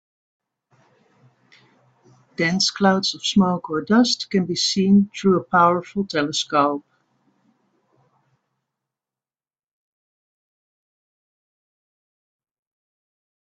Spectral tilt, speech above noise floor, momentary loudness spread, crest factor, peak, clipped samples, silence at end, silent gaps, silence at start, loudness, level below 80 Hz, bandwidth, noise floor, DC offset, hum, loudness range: -4.5 dB/octave; over 71 dB; 7 LU; 22 dB; -2 dBFS; under 0.1%; 6.65 s; none; 2.4 s; -19 LUFS; -64 dBFS; 9 kHz; under -90 dBFS; under 0.1%; none; 8 LU